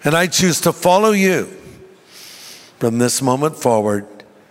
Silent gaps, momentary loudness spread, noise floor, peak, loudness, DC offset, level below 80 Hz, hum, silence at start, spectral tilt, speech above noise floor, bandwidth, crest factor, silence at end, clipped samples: none; 22 LU; -42 dBFS; -2 dBFS; -16 LUFS; under 0.1%; -54 dBFS; none; 0 s; -4 dB/octave; 27 dB; 16.5 kHz; 16 dB; 0.3 s; under 0.1%